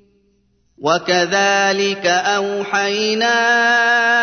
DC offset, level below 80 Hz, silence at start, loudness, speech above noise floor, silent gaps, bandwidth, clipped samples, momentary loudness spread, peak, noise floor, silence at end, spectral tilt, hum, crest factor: under 0.1%; -62 dBFS; 0.8 s; -15 LUFS; 44 dB; none; 6.6 kHz; under 0.1%; 6 LU; -2 dBFS; -60 dBFS; 0 s; -2.5 dB/octave; none; 14 dB